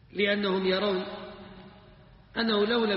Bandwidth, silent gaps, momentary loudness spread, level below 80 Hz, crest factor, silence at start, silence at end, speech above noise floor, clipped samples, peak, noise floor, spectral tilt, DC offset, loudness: 5.8 kHz; none; 19 LU; -60 dBFS; 16 dB; 0.15 s; 0 s; 27 dB; under 0.1%; -14 dBFS; -54 dBFS; -3 dB/octave; under 0.1%; -27 LUFS